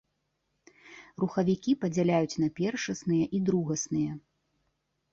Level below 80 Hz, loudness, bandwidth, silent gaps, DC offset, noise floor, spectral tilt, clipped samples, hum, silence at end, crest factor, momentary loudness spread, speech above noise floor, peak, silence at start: -64 dBFS; -29 LUFS; 7.8 kHz; none; under 0.1%; -79 dBFS; -6 dB/octave; under 0.1%; none; 0.95 s; 18 dB; 7 LU; 50 dB; -14 dBFS; 0.85 s